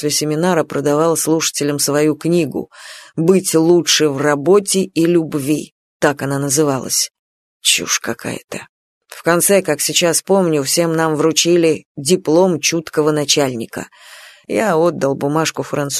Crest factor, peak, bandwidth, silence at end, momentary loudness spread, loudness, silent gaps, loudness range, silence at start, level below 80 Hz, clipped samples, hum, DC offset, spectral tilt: 16 dB; 0 dBFS; 14 kHz; 0 s; 10 LU; -15 LUFS; 5.72-6.00 s, 7.19-7.60 s, 8.69-9.01 s, 11.85-11.95 s; 3 LU; 0 s; -58 dBFS; under 0.1%; none; under 0.1%; -3.5 dB/octave